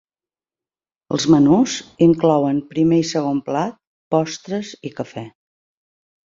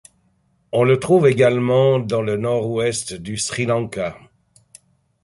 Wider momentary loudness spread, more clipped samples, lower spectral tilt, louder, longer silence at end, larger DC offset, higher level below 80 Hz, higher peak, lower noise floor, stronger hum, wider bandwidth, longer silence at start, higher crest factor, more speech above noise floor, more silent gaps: first, 16 LU vs 11 LU; neither; about the same, -6 dB/octave vs -5.5 dB/octave; about the same, -18 LUFS vs -19 LUFS; about the same, 1 s vs 1.05 s; neither; about the same, -58 dBFS vs -54 dBFS; about the same, -2 dBFS vs -2 dBFS; first, under -90 dBFS vs -62 dBFS; neither; second, 7.8 kHz vs 11.5 kHz; first, 1.1 s vs 0.75 s; about the same, 18 dB vs 16 dB; first, over 73 dB vs 45 dB; first, 3.87-4.11 s vs none